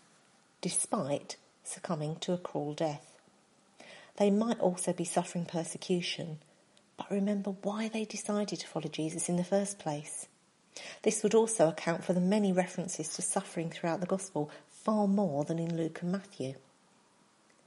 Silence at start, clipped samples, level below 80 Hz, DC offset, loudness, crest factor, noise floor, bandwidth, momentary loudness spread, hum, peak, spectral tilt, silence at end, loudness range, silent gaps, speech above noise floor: 0.65 s; under 0.1%; -82 dBFS; under 0.1%; -33 LUFS; 20 dB; -66 dBFS; 11.5 kHz; 14 LU; none; -14 dBFS; -5 dB/octave; 1.1 s; 5 LU; none; 34 dB